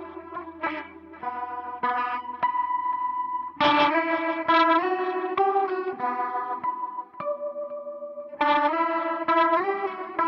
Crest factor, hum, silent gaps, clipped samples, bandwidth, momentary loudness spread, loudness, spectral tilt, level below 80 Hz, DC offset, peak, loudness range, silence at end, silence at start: 16 dB; none; none; under 0.1%; 6.6 kHz; 14 LU; -25 LUFS; -5.5 dB/octave; -68 dBFS; under 0.1%; -8 dBFS; 6 LU; 0 s; 0 s